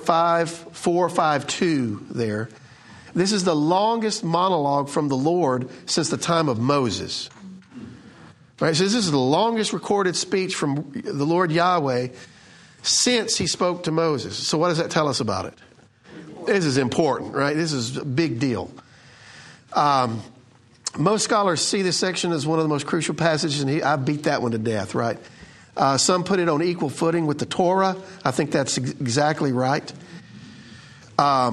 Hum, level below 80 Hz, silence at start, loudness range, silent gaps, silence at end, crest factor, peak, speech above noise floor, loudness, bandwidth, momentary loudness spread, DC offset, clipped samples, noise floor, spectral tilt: none; -62 dBFS; 0 s; 3 LU; none; 0 s; 22 dB; 0 dBFS; 31 dB; -22 LUFS; 12 kHz; 10 LU; under 0.1%; under 0.1%; -52 dBFS; -4.5 dB/octave